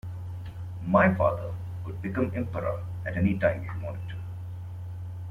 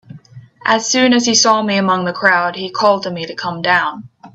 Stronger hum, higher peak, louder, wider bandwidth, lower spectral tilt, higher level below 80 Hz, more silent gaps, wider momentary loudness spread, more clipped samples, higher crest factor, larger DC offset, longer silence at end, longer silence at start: neither; second, -8 dBFS vs 0 dBFS; second, -29 LUFS vs -14 LUFS; second, 4.5 kHz vs 8.2 kHz; first, -9.5 dB/octave vs -2.5 dB/octave; first, -52 dBFS vs -60 dBFS; neither; first, 16 LU vs 12 LU; neither; first, 22 dB vs 16 dB; neither; about the same, 0 s vs 0.05 s; about the same, 0.05 s vs 0.1 s